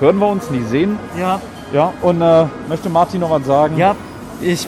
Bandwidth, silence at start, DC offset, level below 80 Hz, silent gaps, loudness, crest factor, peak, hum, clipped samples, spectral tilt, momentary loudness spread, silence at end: 15.5 kHz; 0 s; under 0.1%; -44 dBFS; none; -16 LUFS; 14 dB; 0 dBFS; none; under 0.1%; -6.5 dB/octave; 10 LU; 0 s